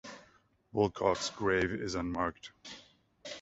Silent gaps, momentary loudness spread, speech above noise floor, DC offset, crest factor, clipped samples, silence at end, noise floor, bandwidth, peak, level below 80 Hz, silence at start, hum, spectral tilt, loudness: none; 20 LU; 33 dB; under 0.1%; 22 dB; under 0.1%; 0 s; -66 dBFS; 8 kHz; -14 dBFS; -56 dBFS; 0.05 s; none; -4.5 dB/octave; -33 LUFS